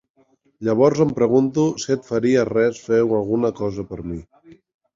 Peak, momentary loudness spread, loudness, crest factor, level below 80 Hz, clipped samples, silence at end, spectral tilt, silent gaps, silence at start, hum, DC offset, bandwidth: -2 dBFS; 13 LU; -20 LUFS; 18 dB; -50 dBFS; under 0.1%; 0.4 s; -6.5 dB/octave; none; 0.6 s; none; under 0.1%; 7.6 kHz